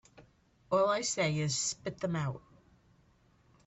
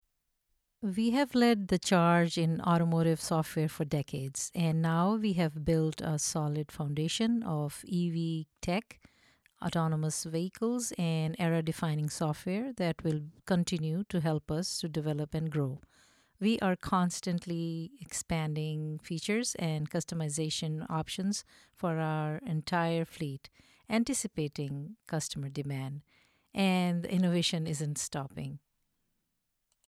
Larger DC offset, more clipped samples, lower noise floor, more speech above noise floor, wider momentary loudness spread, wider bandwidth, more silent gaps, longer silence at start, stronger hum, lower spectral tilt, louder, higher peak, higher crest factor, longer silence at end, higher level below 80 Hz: neither; neither; second, -67 dBFS vs -82 dBFS; second, 34 dB vs 50 dB; about the same, 9 LU vs 9 LU; second, 8.4 kHz vs 14.5 kHz; neither; second, 0.2 s vs 0.8 s; neither; second, -4 dB/octave vs -5.5 dB/octave; about the same, -32 LUFS vs -32 LUFS; second, -18 dBFS vs -14 dBFS; about the same, 18 dB vs 18 dB; about the same, 1.3 s vs 1.35 s; second, -68 dBFS vs -60 dBFS